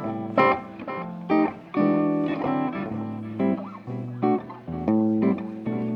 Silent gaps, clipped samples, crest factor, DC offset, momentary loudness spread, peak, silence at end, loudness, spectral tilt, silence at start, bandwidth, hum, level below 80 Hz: none; under 0.1%; 18 dB; under 0.1%; 12 LU; -6 dBFS; 0 s; -25 LUFS; -9.5 dB/octave; 0 s; 5.6 kHz; none; -58 dBFS